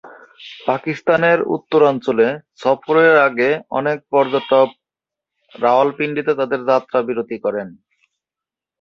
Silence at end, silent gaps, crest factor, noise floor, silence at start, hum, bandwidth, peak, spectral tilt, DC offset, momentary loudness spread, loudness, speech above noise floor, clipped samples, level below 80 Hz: 1.1 s; none; 16 dB; -88 dBFS; 0.05 s; none; 7 kHz; -2 dBFS; -7 dB/octave; under 0.1%; 9 LU; -17 LUFS; 71 dB; under 0.1%; -66 dBFS